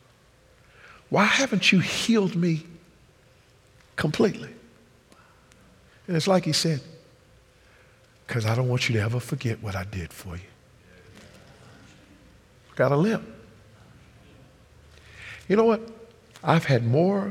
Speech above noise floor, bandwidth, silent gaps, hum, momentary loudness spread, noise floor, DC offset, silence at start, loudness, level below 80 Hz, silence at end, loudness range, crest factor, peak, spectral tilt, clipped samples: 34 dB; 16 kHz; none; none; 20 LU; -57 dBFS; under 0.1%; 1.1 s; -24 LUFS; -60 dBFS; 0 s; 8 LU; 22 dB; -4 dBFS; -5.5 dB/octave; under 0.1%